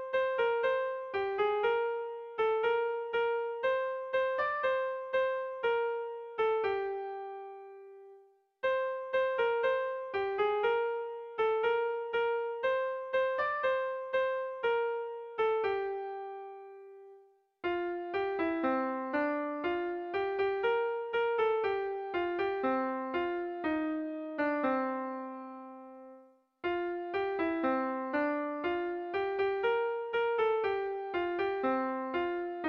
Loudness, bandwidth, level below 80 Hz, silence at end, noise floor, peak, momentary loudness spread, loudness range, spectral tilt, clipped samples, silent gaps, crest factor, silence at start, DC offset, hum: -33 LUFS; 6 kHz; -70 dBFS; 0 s; -61 dBFS; -18 dBFS; 10 LU; 4 LU; -6 dB/octave; under 0.1%; none; 14 dB; 0 s; under 0.1%; none